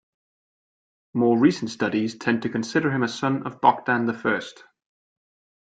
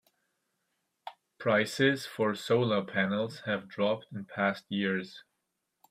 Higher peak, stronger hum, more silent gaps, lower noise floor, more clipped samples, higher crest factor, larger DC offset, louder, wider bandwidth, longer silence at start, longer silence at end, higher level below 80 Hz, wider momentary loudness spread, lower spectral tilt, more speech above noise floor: first, -2 dBFS vs -10 dBFS; neither; neither; first, under -90 dBFS vs -82 dBFS; neither; about the same, 22 dB vs 22 dB; neither; first, -23 LUFS vs -30 LUFS; second, 9 kHz vs 15.5 kHz; about the same, 1.15 s vs 1.05 s; first, 1.1 s vs 0.7 s; first, -66 dBFS vs -74 dBFS; second, 7 LU vs 17 LU; about the same, -6 dB/octave vs -5.5 dB/octave; first, over 67 dB vs 52 dB